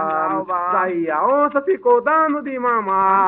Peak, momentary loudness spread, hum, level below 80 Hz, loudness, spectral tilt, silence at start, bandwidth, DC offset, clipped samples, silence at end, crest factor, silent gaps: -2 dBFS; 5 LU; none; -64 dBFS; -18 LUFS; -5 dB/octave; 0 s; 4 kHz; under 0.1%; under 0.1%; 0 s; 14 dB; none